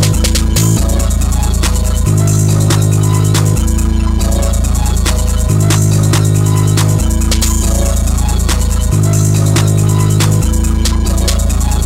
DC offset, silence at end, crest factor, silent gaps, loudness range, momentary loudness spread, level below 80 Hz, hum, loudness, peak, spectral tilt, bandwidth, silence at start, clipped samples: under 0.1%; 0 s; 10 dB; none; 1 LU; 3 LU; -14 dBFS; none; -12 LUFS; 0 dBFS; -5 dB/octave; 16.5 kHz; 0 s; under 0.1%